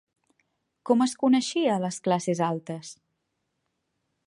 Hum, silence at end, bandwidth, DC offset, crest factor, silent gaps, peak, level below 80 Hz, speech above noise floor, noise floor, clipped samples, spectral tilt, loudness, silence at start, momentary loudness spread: none; 1.35 s; 11.5 kHz; under 0.1%; 20 dB; none; -8 dBFS; -78 dBFS; 54 dB; -79 dBFS; under 0.1%; -5 dB/octave; -25 LUFS; 0.85 s; 16 LU